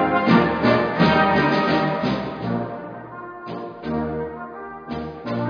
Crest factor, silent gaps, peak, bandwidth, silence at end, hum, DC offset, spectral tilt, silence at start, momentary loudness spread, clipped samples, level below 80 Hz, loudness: 18 dB; none; -4 dBFS; 5.4 kHz; 0 s; none; under 0.1%; -7.5 dB/octave; 0 s; 17 LU; under 0.1%; -46 dBFS; -21 LUFS